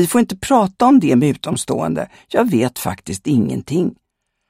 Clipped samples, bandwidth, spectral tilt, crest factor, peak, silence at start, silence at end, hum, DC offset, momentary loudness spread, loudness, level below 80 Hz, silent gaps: under 0.1%; 16.5 kHz; -6 dB/octave; 14 dB; -2 dBFS; 0 s; 0.55 s; none; under 0.1%; 11 LU; -17 LUFS; -50 dBFS; none